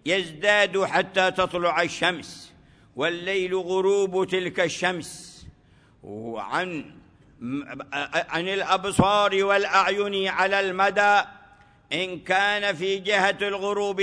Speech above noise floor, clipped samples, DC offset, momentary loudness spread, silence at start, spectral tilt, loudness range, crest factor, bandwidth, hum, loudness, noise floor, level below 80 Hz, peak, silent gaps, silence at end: 33 dB; under 0.1%; under 0.1%; 15 LU; 0.05 s; -4 dB/octave; 9 LU; 20 dB; 11 kHz; none; -23 LUFS; -57 dBFS; -58 dBFS; -4 dBFS; none; 0 s